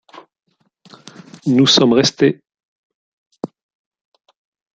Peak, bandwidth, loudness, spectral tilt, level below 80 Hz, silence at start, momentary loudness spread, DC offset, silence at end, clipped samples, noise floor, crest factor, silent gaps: 0 dBFS; 9 kHz; -13 LUFS; -4.5 dB/octave; -60 dBFS; 1.45 s; 21 LU; under 0.1%; 1.3 s; under 0.1%; -48 dBFS; 18 dB; 2.63-3.31 s